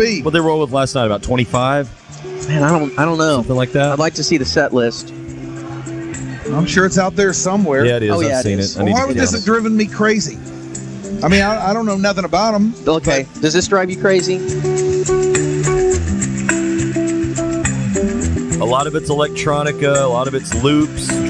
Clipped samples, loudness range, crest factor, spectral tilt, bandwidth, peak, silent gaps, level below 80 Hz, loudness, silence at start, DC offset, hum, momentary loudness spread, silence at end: under 0.1%; 2 LU; 16 dB; -5 dB/octave; 11.5 kHz; 0 dBFS; none; -38 dBFS; -16 LUFS; 0 s; under 0.1%; none; 11 LU; 0 s